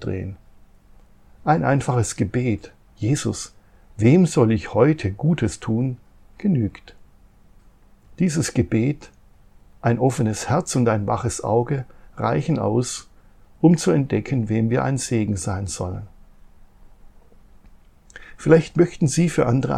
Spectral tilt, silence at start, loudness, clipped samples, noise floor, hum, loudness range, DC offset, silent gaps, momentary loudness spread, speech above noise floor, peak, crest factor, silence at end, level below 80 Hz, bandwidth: -6.5 dB/octave; 0 s; -21 LUFS; under 0.1%; -51 dBFS; none; 6 LU; under 0.1%; none; 11 LU; 31 dB; -2 dBFS; 20 dB; 0 s; -48 dBFS; 13 kHz